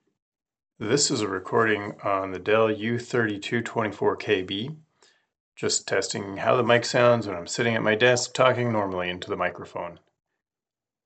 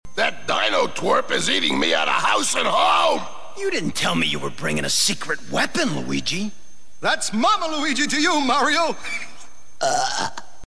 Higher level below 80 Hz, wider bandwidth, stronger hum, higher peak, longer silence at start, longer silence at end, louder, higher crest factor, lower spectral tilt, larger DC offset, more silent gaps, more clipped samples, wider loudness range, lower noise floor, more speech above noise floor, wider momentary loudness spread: second, -74 dBFS vs -54 dBFS; second, 9 kHz vs 11 kHz; neither; about the same, -4 dBFS vs -6 dBFS; first, 0.8 s vs 0 s; first, 1.1 s vs 0.25 s; second, -24 LUFS vs -20 LUFS; first, 22 dB vs 16 dB; first, -4 dB/octave vs -2.5 dB/octave; second, under 0.1% vs 4%; first, 5.40-5.52 s vs none; neither; about the same, 5 LU vs 3 LU; first, under -90 dBFS vs -48 dBFS; first, over 66 dB vs 27 dB; about the same, 10 LU vs 8 LU